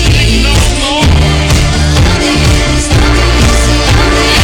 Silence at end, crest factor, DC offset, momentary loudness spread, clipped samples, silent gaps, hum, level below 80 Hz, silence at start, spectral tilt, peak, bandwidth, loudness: 0 s; 6 dB; under 0.1%; 1 LU; under 0.1%; none; none; -12 dBFS; 0 s; -4.5 dB/octave; -2 dBFS; 17.5 kHz; -8 LUFS